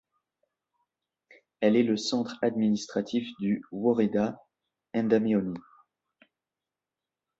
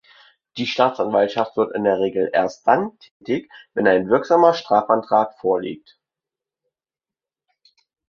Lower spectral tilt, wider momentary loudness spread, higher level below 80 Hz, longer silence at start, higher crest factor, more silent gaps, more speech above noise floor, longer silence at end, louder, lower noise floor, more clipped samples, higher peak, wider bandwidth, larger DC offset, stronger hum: about the same, -6 dB/octave vs -6 dB/octave; second, 8 LU vs 13 LU; second, -70 dBFS vs -62 dBFS; first, 1.6 s vs 0.55 s; about the same, 20 dB vs 20 dB; second, none vs 3.11-3.20 s; second, 63 dB vs over 71 dB; second, 1.8 s vs 2.3 s; second, -28 LUFS vs -19 LUFS; about the same, -90 dBFS vs under -90 dBFS; neither; second, -10 dBFS vs -2 dBFS; first, 8 kHz vs 7 kHz; neither; neither